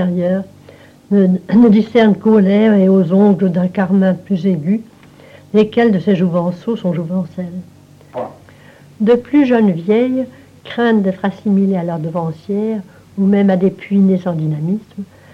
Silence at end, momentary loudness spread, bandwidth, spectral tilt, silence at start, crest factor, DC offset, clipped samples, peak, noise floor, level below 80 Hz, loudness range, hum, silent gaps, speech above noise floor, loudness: 0.3 s; 15 LU; 5.8 kHz; -9.5 dB/octave; 0 s; 14 dB; under 0.1%; under 0.1%; 0 dBFS; -42 dBFS; -56 dBFS; 6 LU; none; none; 28 dB; -14 LUFS